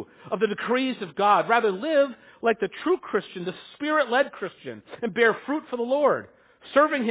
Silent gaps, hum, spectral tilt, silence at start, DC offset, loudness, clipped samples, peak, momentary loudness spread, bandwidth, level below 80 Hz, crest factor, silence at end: none; none; -8.5 dB/octave; 0 s; under 0.1%; -24 LUFS; under 0.1%; -6 dBFS; 13 LU; 4 kHz; -70 dBFS; 20 dB; 0 s